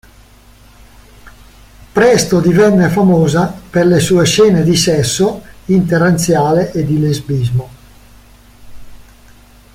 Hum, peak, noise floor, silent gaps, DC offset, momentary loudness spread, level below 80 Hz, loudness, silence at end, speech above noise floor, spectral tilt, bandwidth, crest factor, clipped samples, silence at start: none; 0 dBFS; -42 dBFS; none; under 0.1%; 7 LU; -40 dBFS; -12 LUFS; 0.8 s; 31 dB; -5.5 dB/octave; 16.5 kHz; 12 dB; under 0.1%; 1.25 s